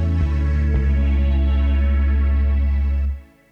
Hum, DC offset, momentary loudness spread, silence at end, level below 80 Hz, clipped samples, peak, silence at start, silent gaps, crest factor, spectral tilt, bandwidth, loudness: none; under 0.1%; 3 LU; 0.3 s; -18 dBFS; under 0.1%; -8 dBFS; 0 s; none; 8 dB; -9.5 dB/octave; 4.1 kHz; -20 LUFS